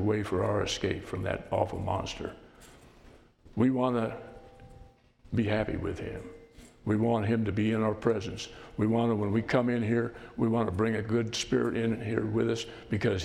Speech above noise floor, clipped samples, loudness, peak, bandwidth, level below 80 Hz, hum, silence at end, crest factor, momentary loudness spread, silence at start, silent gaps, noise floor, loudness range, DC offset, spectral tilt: 27 dB; under 0.1%; -30 LUFS; -12 dBFS; 11.5 kHz; -52 dBFS; none; 0 s; 18 dB; 11 LU; 0 s; none; -56 dBFS; 5 LU; under 0.1%; -6.5 dB/octave